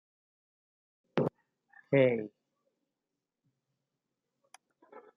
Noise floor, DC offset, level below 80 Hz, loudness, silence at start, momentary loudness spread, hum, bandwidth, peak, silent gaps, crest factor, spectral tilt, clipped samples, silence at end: -89 dBFS; under 0.1%; -82 dBFS; -31 LUFS; 1.15 s; 10 LU; none; 7.2 kHz; -12 dBFS; none; 24 dB; -6.5 dB/octave; under 0.1%; 0.2 s